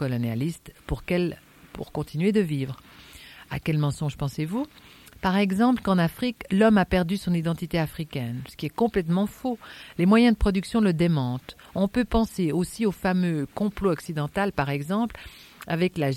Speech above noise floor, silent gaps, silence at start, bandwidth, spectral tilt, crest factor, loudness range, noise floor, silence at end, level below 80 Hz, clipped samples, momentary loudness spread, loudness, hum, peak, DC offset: 22 dB; none; 0 s; 16.5 kHz; -7 dB/octave; 18 dB; 5 LU; -47 dBFS; 0 s; -42 dBFS; under 0.1%; 14 LU; -25 LUFS; none; -6 dBFS; under 0.1%